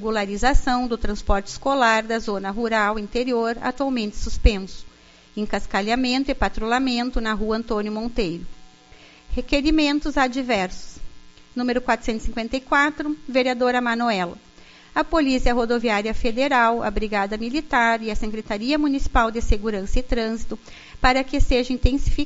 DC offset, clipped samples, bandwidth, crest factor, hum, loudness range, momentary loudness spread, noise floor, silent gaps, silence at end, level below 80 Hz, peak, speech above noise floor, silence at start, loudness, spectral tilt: under 0.1%; under 0.1%; 8 kHz; 20 dB; none; 3 LU; 9 LU; -49 dBFS; none; 0 s; -28 dBFS; -2 dBFS; 28 dB; 0 s; -22 LUFS; -3.5 dB/octave